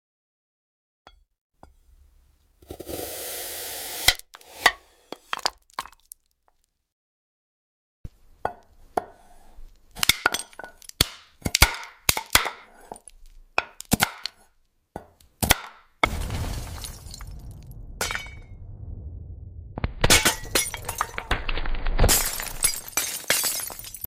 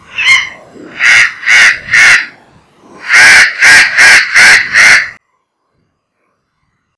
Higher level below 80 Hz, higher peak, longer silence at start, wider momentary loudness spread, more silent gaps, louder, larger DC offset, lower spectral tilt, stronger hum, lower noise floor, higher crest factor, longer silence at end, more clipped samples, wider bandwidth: first, -36 dBFS vs -44 dBFS; about the same, 0 dBFS vs 0 dBFS; first, 2.7 s vs 0.15 s; first, 24 LU vs 8 LU; first, 6.92-8.04 s vs none; second, -24 LUFS vs -3 LUFS; neither; first, -2 dB/octave vs 1 dB/octave; neither; first, -68 dBFS vs -62 dBFS; first, 28 dB vs 8 dB; second, 0 s vs 1.85 s; second, under 0.1% vs 8%; first, 17 kHz vs 11 kHz